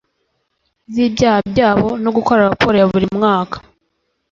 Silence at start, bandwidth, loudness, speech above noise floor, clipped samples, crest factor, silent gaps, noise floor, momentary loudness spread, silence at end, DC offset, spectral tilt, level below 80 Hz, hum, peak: 0.9 s; 7.6 kHz; -14 LUFS; 54 dB; under 0.1%; 16 dB; none; -68 dBFS; 7 LU; 0.75 s; under 0.1%; -6.5 dB/octave; -42 dBFS; none; 0 dBFS